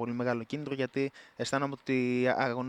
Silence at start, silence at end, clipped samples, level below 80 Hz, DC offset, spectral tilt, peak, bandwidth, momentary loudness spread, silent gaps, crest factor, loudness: 0 s; 0 s; under 0.1%; -74 dBFS; under 0.1%; -6 dB/octave; -14 dBFS; 11 kHz; 8 LU; none; 18 dB; -32 LUFS